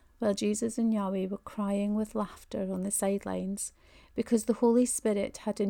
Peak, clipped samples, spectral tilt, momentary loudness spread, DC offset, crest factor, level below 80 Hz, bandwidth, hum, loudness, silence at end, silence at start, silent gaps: -14 dBFS; under 0.1%; -5.5 dB/octave; 11 LU; under 0.1%; 16 dB; -60 dBFS; 19 kHz; none; -31 LUFS; 0 s; 0.2 s; none